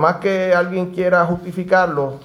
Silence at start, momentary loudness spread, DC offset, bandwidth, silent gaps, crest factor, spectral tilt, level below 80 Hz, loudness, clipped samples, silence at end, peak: 0 s; 5 LU; under 0.1%; 12 kHz; none; 16 dB; -7 dB/octave; -52 dBFS; -17 LUFS; under 0.1%; 0 s; 0 dBFS